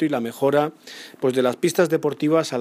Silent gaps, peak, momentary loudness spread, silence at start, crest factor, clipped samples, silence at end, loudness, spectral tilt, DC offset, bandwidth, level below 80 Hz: none; -4 dBFS; 7 LU; 0 s; 18 dB; under 0.1%; 0 s; -21 LUFS; -5.5 dB/octave; under 0.1%; 15.5 kHz; -74 dBFS